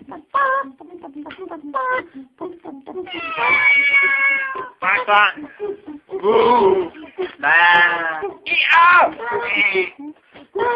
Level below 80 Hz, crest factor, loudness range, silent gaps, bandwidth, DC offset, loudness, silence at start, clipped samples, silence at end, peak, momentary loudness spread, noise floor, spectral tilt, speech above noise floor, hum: -60 dBFS; 18 dB; 6 LU; none; 7.4 kHz; under 0.1%; -15 LUFS; 0.1 s; under 0.1%; 0 s; 0 dBFS; 22 LU; -39 dBFS; -5 dB/octave; 25 dB; none